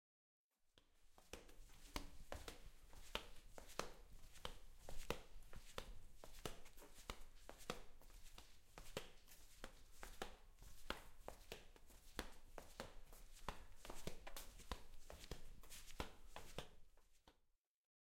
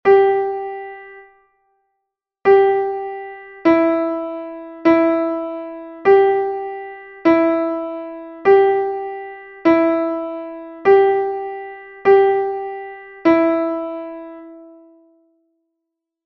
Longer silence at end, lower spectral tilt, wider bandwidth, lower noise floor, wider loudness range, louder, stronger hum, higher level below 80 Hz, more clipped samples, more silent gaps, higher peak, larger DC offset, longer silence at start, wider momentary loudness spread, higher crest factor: second, 0.6 s vs 1.6 s; second, -3 dB/octave vs -7.5 dB/octave; first, 16.5 kHz vs 5.8 kHz; about the same, -77 dBFS vs -79 dBFS; about the same, 3 LU vs 4 LU; second, -58 LUFS vs -17 LUFS; neither; about the same, -60 dBFS vs -60 dBFS; neither; neither; second, -24 dBFS vs -2 dBFS; neither; first, 0.65 s vs 0.05 s; second, 13 LU vs 19 LU; first, 30 dB vs 16 dB